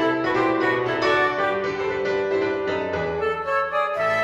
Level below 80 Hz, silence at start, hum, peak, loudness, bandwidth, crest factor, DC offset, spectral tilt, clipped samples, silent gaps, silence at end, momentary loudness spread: -54 dBFS; 0 s; none; -8 dBFS; -22 LUFS; 9.8 kHz; 14 dB; under 0.1%; -5.5 dB/octave; under 0.1%; none; 0 s; 5 LU